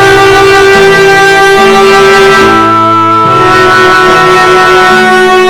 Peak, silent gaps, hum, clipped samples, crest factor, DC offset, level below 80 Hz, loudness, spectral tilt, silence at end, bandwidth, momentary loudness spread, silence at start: 0 dBFS; none; none; 0.3%; 2 dB; under 0.1%; -30 dBFS; -3 LUFS; -4 dB/octave; 0 s; 18 kHz; 2 LU; 0 s